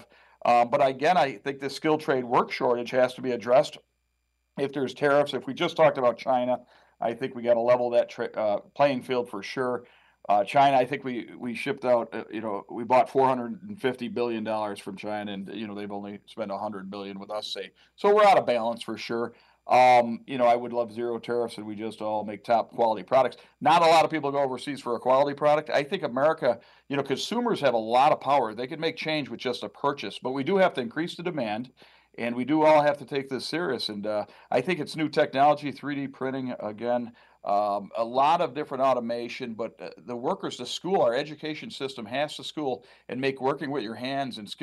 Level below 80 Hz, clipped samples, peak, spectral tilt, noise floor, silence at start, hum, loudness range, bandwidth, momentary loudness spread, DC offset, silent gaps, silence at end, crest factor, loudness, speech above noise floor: -74 dBFS; under 0.1%; -10 dBFS; -5.5 dB/octave; -75 dBFS; 0 s; none; 6 LU; 12.5 kHz; 13 LU; under 0.1%; none; 0.1 s; 18 dB; -26 LUFS; 49 dB